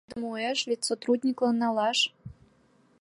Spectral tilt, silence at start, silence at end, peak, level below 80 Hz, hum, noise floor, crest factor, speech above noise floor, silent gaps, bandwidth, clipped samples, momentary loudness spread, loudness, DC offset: -3 dB/octave; 0.1 s; 0.7 s; -14 dBFS; -66 dBFS; none; -63 dBFS; 16 dB; 36 dB; none; 11.5 kHz; under 0.1%; 4 LU; -27 LUFS; under 0.1%